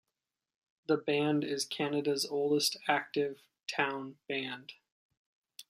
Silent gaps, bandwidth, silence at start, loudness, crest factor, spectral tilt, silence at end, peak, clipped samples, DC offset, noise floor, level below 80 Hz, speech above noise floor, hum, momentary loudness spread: 4.92-5.10 s, 5.17-5.44 s; 15 kHz; 0.9 s; -33 LUFS; 22 dB; -3.5 dB/octave; 0.05 s; -12 dBFS; under 0.1%; under 0.1%; -89 dBFS; -82 dBFS; 56 dB; none; 12 LU